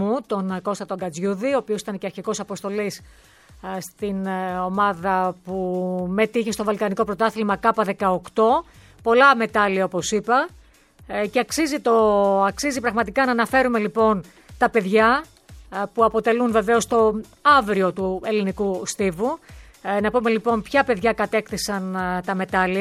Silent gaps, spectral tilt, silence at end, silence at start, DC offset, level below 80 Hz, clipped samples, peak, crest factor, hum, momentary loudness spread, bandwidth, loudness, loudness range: none; -5 dB/octave; 0 s; 0 s; under 0.1%; -50 dBFS; under 0.1%; -2 dBFS; 18 dB; none; 11 LU; 15 kHz; -21 LUFS; 7 LU